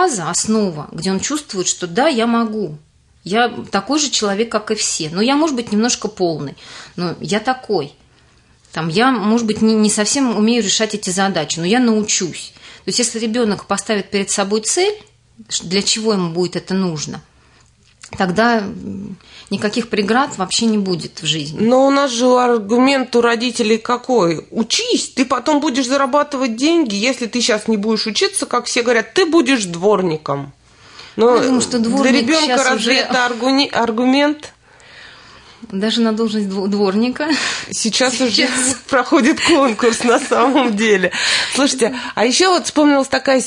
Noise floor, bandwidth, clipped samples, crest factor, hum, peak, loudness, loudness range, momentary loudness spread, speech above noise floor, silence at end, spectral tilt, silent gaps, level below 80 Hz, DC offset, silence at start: -51 dBFS; 11 kHz; under 0.1%; 14 dB; none; -2 dBFS; -16 LUFS; 5 LU; 8 LU; 35 dB; 0 s; -3.5 dB/octave; none; -56 dBFS; under 0.1%; 0 s